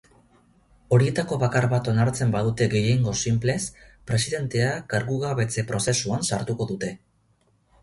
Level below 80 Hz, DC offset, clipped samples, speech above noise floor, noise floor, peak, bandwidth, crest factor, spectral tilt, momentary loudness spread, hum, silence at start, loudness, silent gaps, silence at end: -50 dBFS; under 0.1%; under 0.1%; 41 dB; -65 dBFS; -6 dBFS; 11.5 kHz; 18 dB; -5 dB/octave; 7 LU; none; 0.9 s; -24 LUFS; none; 0.85 s